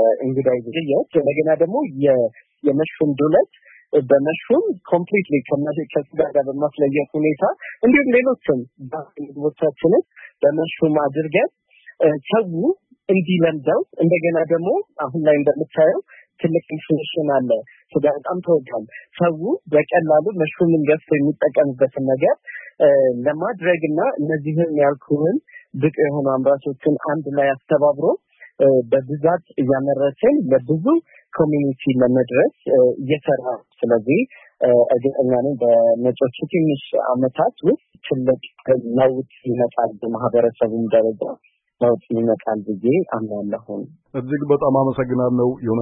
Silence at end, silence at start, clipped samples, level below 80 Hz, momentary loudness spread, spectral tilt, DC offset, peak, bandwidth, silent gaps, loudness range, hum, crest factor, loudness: 0 s; 0 s; under 0.1%; -62 dBFS; 8 LU; -12.5 dB/octave; under 0.1%; -4 dBFS; 3.8 kHz; none; 2 LU; none; 14 dB; -19 LUFS